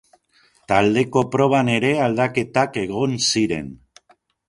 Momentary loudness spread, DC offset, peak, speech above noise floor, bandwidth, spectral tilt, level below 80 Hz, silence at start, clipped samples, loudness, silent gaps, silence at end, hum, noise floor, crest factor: 6 LU; under 0.1%; 0 dBFS; 40 dB; 11.5 kHz; -4.5 dB/octave; -52 dBFS; 0.7 s; under 0.1%; -19 LUFS; none; 0.75 s; none; -59 dBFS; 20 dB